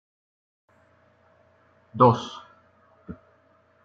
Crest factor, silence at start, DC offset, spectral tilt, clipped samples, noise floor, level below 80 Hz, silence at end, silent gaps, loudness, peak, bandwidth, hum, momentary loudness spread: 24 dB; 1.95 s; under 0.1%; -7.5 dB/octave; under 0.1%; -61 dBFS; -64 dBFS; 0.7 s; none; -21 LUFS; -6 dBFS; 7.6 kHz; none; 25 LU